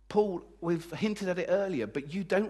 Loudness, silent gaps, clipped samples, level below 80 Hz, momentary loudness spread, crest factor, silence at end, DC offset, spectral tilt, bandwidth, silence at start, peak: -32 LUFS; none; under 0.1%; -62 dBFS; 6 LU; 18 dB; 0 s; under 0.1%; -6.5 dB/octave; 12.5 kHz; 0.1 s; -14 dBFS